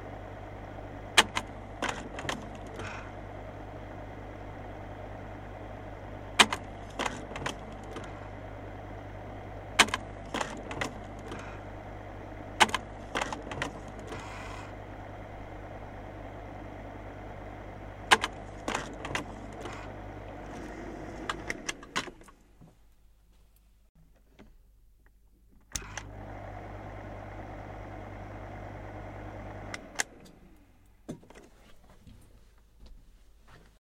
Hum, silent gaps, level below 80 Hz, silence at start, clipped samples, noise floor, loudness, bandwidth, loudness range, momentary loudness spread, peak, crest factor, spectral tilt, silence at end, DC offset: none; 23.89-23.95 s; -50 dBFS; 0 s; under 0.1%; -60 dBFS; -35 LUFS; 16.5 kHz; 13 LU; 19 LU; -2 dBFS; 36 dB; -2.5 dB/octave; 0.2 s; under 0.1%